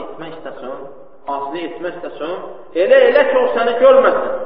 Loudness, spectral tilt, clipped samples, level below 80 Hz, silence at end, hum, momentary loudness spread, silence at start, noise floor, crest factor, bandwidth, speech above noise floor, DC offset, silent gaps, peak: -14 LUFS; -1.5 dB/octave; under 0.1%; -54 dBFS; 0 s; none; 20 LU; 0 s; -37 dBFS; 16 dB; 5.2 kHz; 23 dB; 1%; none; 0 dBFS